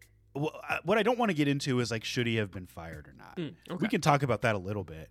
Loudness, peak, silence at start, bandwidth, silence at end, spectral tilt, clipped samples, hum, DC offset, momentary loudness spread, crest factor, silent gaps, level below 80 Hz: -30 LUFS; -10 dBFS; 0.35 s; 15.5 kHz; 0.05 s; -5.5 dB/octave; under 0.1%; none; under 0.1%; 17 LU; 22 dB; none; -60 dBFS